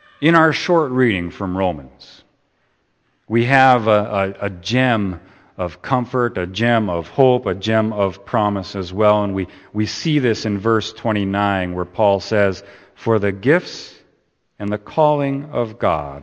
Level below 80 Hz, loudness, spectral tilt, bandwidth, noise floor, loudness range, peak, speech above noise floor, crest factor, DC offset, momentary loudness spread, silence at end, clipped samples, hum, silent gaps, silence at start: -50 dBFS; -18 LUFS; -6.5 dB/octave; 8.8 kHz; -64 dBFS; 2 LU; 0 dBFS; 47 dB; 18 dB; under 0.1%; 11 LU; 0 s; under 0.1%; none; none; 0.2 s